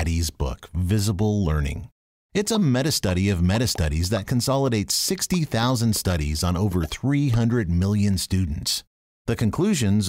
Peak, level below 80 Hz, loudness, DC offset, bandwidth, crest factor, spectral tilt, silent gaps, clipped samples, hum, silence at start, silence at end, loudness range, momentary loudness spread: -10 dBFS; -34 dBFS; -23 LUFS; under 0.1%; 16 kHz; 12 dB; -5 dB/octave; 1.92-2.30 s, 8.87-9.25 s; under 0.1%; none; 0 s; 0 s; 1 LU; 6 LU